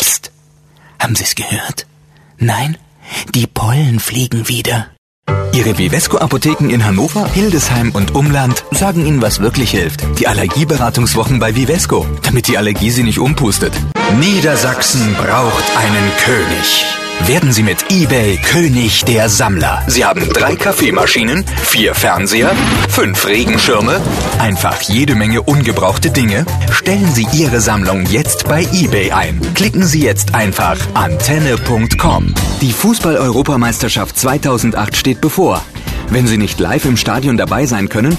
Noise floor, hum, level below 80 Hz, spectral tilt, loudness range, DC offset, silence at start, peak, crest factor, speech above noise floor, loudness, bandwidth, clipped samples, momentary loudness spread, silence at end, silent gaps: -46 dBFS; none; -26 dBFS; -4.5 dB/octave; 3 LU; under 0.1%; 0 s; 0 dBFS; 12 dB; 34 dB; -12 LUFS; 14.5 kHz; under 0.1%; 5 LU; 0 s; 4.98-5.23 s